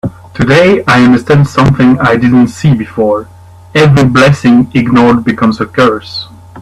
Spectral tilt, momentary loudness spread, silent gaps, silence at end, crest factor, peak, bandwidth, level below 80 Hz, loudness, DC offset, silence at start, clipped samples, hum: -7 dB/octave; 9 LU; none; 0 s; 8 dB; 0 dBFS; 12 kHz; -36 dBFS; -8 LUFS; under 0.1%; 0.05 s; 0.1%; none